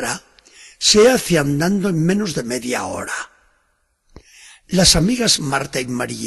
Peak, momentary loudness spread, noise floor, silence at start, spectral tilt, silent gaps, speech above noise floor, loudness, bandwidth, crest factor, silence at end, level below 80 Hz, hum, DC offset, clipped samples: 0 dBFS; 13 LU; -65 dBFS; 0 s; -3.5 dB/octave; none; 48 dB; -16 LUFS; 12.5 kHz; 18 dB; 0 s; -40 dBFS; none; under 0.1%; under 0.1%